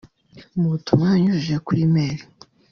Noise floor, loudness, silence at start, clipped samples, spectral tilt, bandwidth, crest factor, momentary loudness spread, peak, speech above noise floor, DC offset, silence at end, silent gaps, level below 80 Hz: -49 dBFS; -20 LUFS; 0.35 s; under 0.1%; -7.5 dB/octave; 6.6 kHz; 18 dB; 10 LU; -4 dBFS; 30 dB; under 0.1%; 0.5 s; none; -54 dBFS